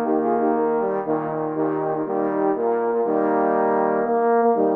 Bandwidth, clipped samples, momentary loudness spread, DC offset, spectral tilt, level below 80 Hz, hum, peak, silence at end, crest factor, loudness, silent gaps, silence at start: 3.1 kHz; under 0.1%; 5 LU; under 0.1%; -11 dB/octave; -70 dBFS; none; -8 dBFS; 0 s; 14 dB; -21 LUFS; none; 0 s